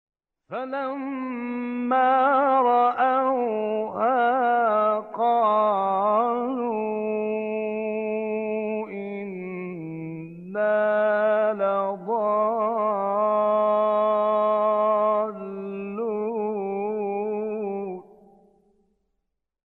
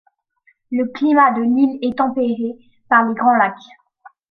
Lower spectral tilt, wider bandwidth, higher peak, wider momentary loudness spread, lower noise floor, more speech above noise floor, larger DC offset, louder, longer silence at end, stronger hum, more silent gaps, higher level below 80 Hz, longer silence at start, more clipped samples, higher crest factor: first, -9 dB/octave vs -7.5 dB/octave; second, 4.3 kHz vs 6 kHz; second, -10 dBFS vs -2 dBFS; first, 13 LU vs 9 LU; first, -80 dBFS vs -60 dBFS; first, 58 dB vs 43 dB; neither; second, -24 LUFS vs -17 LUFS; first, 1.75 s vs 0.25 s; neither; neither; second, -76 dBFS vs -64 dBFS; second, 0.5 s vs 0.7 s; neither; about the same, 14 dB vs 16 dB